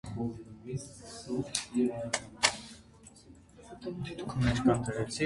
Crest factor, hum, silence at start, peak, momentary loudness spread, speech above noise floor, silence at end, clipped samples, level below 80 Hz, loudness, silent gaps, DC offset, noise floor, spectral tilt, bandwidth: 28 dB; none; 0.05 s; -6 dBFS; 18 LU; 23 dB; 0 s; under 0.1%; -52 dBFS; -33 LUFS; none; under 0.1%; -56 dBFS; -4.5 dB/octave; 11.5 kHz